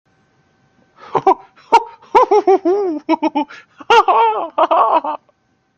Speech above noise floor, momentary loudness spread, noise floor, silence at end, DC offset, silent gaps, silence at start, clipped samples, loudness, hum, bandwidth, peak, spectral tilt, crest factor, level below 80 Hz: 45 dB; 11 LU; -59 dBFS; 0.6 s; under 0.1%; none; 1.1 s; under 0.1%; -15 LUFS; none; 8.6 kHz; 0 dBFS; -4.5 dB/octave; 16 dB; -60 dBFS